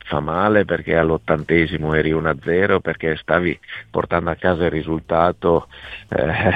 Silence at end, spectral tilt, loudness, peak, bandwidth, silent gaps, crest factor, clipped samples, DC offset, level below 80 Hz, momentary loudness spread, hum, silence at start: 0 s; -8.5 dB/octave; -19 LUFS; -2 dBFS; 4.9 kHz; none; 18 dB; under 0.1%; under 0.1%; -40 dBFS; 7 LU; none; 0.05 s